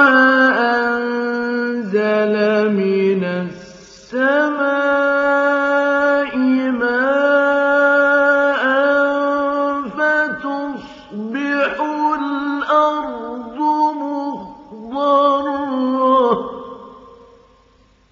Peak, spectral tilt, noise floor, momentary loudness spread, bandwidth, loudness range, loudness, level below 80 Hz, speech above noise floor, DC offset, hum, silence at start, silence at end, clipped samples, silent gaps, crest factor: 0 dBFS; -3 dB/octave; -53 dBFS; 14 LU; 7.4 kHz; 5 LU; -16 LUFS; -58 dBFS; 37 dB; under 0.1%; none; 0 s; 1.05 s; under 0.1%; none; 16 dB